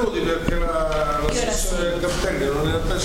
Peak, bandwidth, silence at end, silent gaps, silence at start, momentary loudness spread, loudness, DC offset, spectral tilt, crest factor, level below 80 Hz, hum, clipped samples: -6 dBFS; 16.5 kHz; 0 s; none; 0 s; 1 LU; -22 LUFS; under 0.1%; -4.5 dB/octave; 16 dB; -28 dBFS; none; under 0.1%